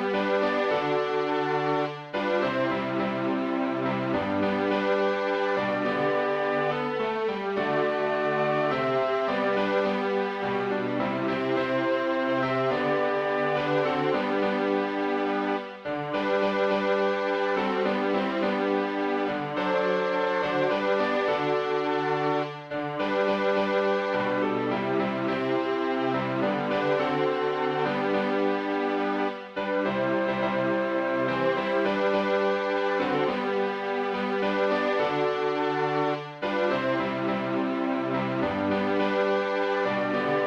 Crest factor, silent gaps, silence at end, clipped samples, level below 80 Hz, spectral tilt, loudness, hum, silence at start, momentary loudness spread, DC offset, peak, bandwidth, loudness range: 14 dB; none; 0 s; under 0.1%; -64 dBFS; -6.5 dB/octave; -26 LUFS; none; 0 s; 3 LU; under 0.1%; -12 dBFS; 7.8 kHz; 1 LU